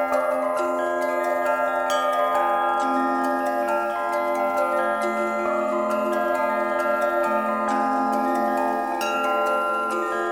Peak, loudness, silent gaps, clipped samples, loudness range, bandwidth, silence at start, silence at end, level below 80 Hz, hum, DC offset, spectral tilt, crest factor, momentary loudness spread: -10 dBFS; -23 LUFS; none; under 0.1%; 1 LU; 17.5 kHz; 0 s; 0 s; -66 dBFS; none; under 0.1%; -4 dB/octave; 14 dB; 2 LU